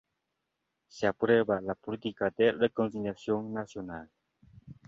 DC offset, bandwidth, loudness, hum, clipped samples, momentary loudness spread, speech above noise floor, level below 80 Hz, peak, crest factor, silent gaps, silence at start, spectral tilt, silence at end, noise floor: under 0.1%; 7.6 kHz; -30 LUFS; none; under 0.1%; 14 LU; 53 dB; -64 dBFS; -12 dBFS; 20 dB; none; 0.95 s; -6.5 dB/octave; 0.15 s; -83 dBFS